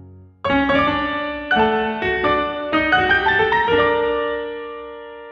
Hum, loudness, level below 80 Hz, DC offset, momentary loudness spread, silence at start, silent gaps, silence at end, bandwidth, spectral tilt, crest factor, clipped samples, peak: none; -18 LUFS; -42 dBFS; under 0.1%; 14 LU; 0 s; none; 0 s; 6.8 kHz; -6.5 dB/octave; 16 dB; under 0.1%; -2 dBFS